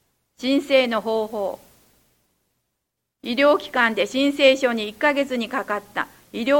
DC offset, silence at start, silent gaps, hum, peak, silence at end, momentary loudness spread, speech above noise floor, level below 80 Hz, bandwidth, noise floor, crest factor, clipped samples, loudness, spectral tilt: under 0.1%; 0.4 s; none; none; -2 dBFS; 0 s; 12 LU; 58 dB; -64 dBFS; 17 kHz; -79 dBFS; 20 dB; under 0.1%; -21 LUFS; -3.5 dB/octave